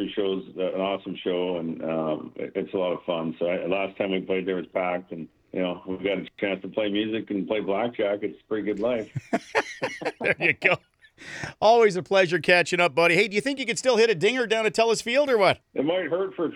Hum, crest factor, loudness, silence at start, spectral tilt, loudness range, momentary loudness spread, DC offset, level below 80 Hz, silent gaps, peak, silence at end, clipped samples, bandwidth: none; 22 dB; -25 LUFS; 0 s; -4.5 dB/octave; 7 LU; 11 LU; under 0.1%; -66 dBFS; none; -4 dBFS; 0 s; under 0.1%; 13 kHz